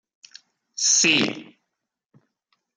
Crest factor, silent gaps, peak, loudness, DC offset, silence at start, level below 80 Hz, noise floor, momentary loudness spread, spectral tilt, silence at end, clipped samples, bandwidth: 22 dB; none; -4 dBFS; -18 LUFS; under 0.1%; 0.8 s; -76 dBFS; -81 dBFS; 22 LU; -0.5 dB/octave; 1.35 s; under 0.1%; 11 kHz